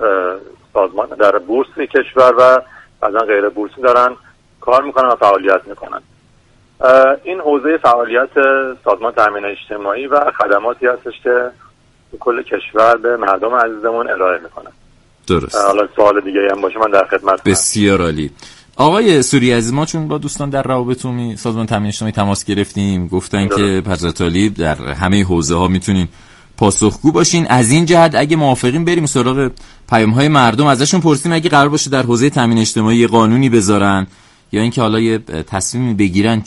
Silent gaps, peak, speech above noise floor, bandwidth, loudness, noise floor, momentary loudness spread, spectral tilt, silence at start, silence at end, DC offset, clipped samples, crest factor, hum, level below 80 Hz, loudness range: none; 0 dBFS; 37 dB; 11.5 kHz; -13 LUFS; -50 dBFS; 9 LU; -5 dB/octave; 0 s; 0.05 s; under 0.1%; under 0.1%; 14 dB; none; -40 dBFS; 4 LU